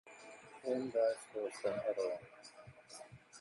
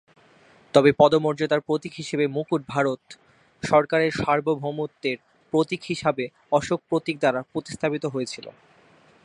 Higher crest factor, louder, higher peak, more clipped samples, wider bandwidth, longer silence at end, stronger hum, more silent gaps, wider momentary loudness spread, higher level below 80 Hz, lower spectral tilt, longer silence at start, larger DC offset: about the same, 18 dB vs 22 dB; second, -39 LUFS vs -24 LUFS; second, -22 dBFS vs -2 dBFS; neither; about the same, 11.5 kHz vs 11 kHz; second, 0 s vs 0.75 s; neither; neither; first, 20 LU vs 12 LU; second, -80 dBFS vs -60 dBFS; about the same, -4.5 dB/octave vs -5.5 dB/octave; second, 0.05 s vs 0.75 s; neither